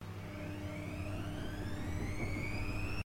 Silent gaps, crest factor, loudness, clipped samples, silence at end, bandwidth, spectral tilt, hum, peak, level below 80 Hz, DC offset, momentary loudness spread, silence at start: none; 12 dB; -41 LUFS; under 0.1%; 0 s; 16 kHz; -6 dB/octave; none; -26 dBFS; -48 dBFS; under 0.1%; 4 LU; 0 s